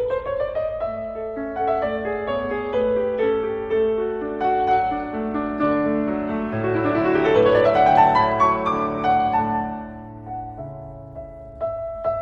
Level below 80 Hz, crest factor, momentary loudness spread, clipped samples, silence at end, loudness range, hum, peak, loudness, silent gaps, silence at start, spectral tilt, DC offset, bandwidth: -46 dBFS; 18 dB; 17 LU; under 0.1%; 0 s; 6 LU; none; -2 dBFS; -21 LUFS; none; 0 s; -7.5 dB/octave; under 0.1%; 7 kHz